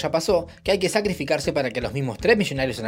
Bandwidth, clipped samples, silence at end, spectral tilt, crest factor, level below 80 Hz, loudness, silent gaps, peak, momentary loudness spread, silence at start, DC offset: 16 kHz; under 0.1%; 0 s; -5 dB/octave; 18 dB; -46 dBFS; -23 LUFS; none; -4 dBFS; 6 LU; 0 s; under 0.1%